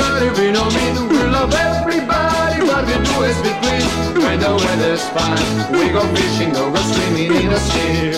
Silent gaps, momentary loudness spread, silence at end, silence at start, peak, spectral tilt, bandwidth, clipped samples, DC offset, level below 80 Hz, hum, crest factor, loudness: none; 2 LU; 0 s; 0 s; -2 dBFS; -4.5 dB/octave; 16 kHz; under 0.1%; under 0.1%; -30 dBFS; none; 14 dB; -15 LUFS